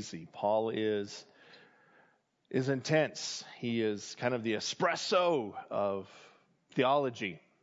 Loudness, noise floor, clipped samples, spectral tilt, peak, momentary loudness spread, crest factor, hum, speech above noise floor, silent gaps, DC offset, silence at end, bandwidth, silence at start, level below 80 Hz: -33 LUFS; -70 dBFS; under 0.1%; -3.5 dB/octave; -14 dBFS; 11 LU; 20 dB; none; 38 dB; none; under 0.1%; 0.25 s; 7.6 kHz; 0 s; -82 dBFS